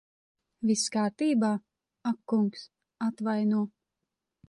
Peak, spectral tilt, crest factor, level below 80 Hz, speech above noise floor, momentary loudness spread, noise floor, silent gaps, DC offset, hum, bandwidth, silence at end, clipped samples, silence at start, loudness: -16 dBFS; -5 dB/octave; 14 dB; -78 dBFS; 58 dB; 9 LU; -86 dBFS; none; under 0.1%; none; 11.5 kHz; 0.8 s; under 0.1%; 0.6 s; -29 LUFS